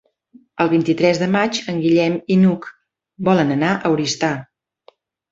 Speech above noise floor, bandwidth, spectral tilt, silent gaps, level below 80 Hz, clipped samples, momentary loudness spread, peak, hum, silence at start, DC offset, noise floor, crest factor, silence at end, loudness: 37 dB; 7.8 kHz; -6 dB/octave; none; -58 dBFS; under 0.1%; 8 LU; -2 dBFS; none; 0.55 s; under 0.1%; -54 dBFS; 16 dB; 0.85 s; -18 LUFS